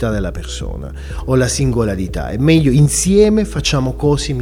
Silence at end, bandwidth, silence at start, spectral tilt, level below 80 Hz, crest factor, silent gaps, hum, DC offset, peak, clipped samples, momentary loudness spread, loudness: 0 s; 16 kHz; 0 s; -5.5 dB/octave; -26 dBFS; 14 dB; none; none; 0.1%; 0 dBFS; under 0.1%; 14 LU; -15 LUFS